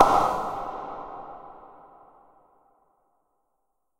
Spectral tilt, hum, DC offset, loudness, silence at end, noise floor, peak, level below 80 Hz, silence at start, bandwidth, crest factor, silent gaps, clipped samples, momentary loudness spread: -4.5 dB/octave; none; under 0.1%; -27 LUFS; 2.3 s; -78 dBFS; 0 dBFS; -52 dBFS; 0 s; 16 kHz; 28 dB; none; under 0.1%; 26 LU